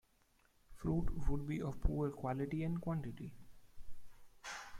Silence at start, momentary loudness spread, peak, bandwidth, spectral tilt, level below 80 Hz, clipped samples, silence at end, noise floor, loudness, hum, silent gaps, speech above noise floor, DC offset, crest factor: 0.7 s; 10 LU; -20 dBFS; 15 kHz; -7.5 dB/octave; -46 dBFS; under 0.1%; 0 s; -73 dBFS; -41 LUFS; none; none; 36 dB; under 0.1%; 18 dB